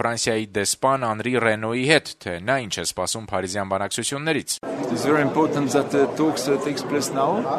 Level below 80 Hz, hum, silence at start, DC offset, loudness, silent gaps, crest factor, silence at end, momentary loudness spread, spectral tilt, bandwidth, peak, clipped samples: -58 dBFS; none; 0 s; under 0.1%; -22 LUFS; none; 20 dB; 0 s; 7 LU; -4 dB/octave; 13.5 kHz; -2 dBFS; under 0.1%